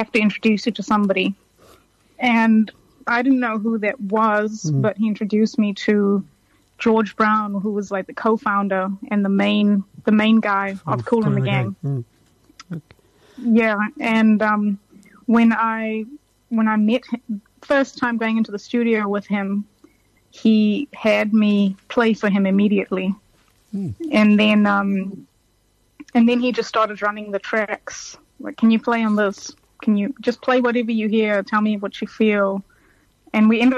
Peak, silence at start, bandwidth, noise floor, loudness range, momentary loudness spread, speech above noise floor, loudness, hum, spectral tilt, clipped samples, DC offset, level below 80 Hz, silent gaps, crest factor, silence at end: -6 dBFS; 0 s; 7.6 kHz; -61 dBFS; 3 LU; 12 LU; 43 dB; -19 LUFS; none; -6.5 dB/octave; under 0.1%; under 0.1%; -62 dBFS; none; 14 dB; 0 s